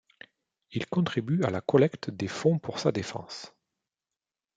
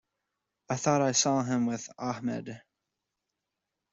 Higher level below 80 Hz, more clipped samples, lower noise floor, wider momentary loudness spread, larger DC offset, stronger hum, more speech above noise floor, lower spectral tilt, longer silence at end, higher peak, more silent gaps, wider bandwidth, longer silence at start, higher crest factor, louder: about the same, -68 dBFS vs -70 dBFS; neither; first, under -90 dBFS vs -86 dBFS; about the same, 14 LU vs 14 LU; neither; neither; first, over 62 dB vs 57 dB; first, -6.5 dB/octave vs -4 dB/octave; second, 1.1 s vs 1.35 s; first, -8 dBFS vs -12 dBFS; neither; first, 9.2 kHz vs 8.2 kHz; about the same, 0.7 s vs 0.7 s; about the same, 22 dB vs 20 dB; about the same, -28 LUFS vs -29 LUFS